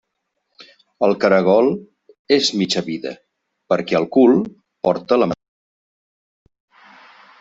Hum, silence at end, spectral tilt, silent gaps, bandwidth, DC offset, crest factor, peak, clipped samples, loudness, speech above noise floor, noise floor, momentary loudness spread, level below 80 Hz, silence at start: none; 2.05 s; -5 dB/octave; 2.19-2.25 s; 8 kHz; under 0.1%; 18 dB; -2 dBFS; under 0.1%; -17 LUFS; 58 dB; -74 dBFS; 14 LU; -60 dBFS; 1 s